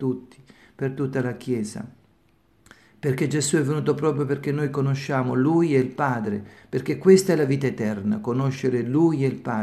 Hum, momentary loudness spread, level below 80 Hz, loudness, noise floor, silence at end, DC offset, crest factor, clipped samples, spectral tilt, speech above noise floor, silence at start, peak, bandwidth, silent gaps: none; 11 LU; -64 dBFS; -23 LUFS; -62 dBFS; 0 s; under 0.1%; 20 dB; under 0.1%; -6.5 dB/octave; 39 dB; 0 s; -4 dBFS; 13.5 kHz; none